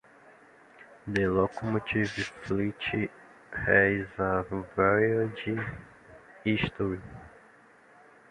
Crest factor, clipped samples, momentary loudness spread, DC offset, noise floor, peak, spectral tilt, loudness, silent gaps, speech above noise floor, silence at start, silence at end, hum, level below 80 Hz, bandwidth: 22 dB; under 0.1%; 15 LU; under 0.1%; -57 dBFS; -8 dBFS; -7 dB/octave; -29 LUFS; none; 29 dB; 0.8 s; 1 s; none; -52 dBFS; 11 kHz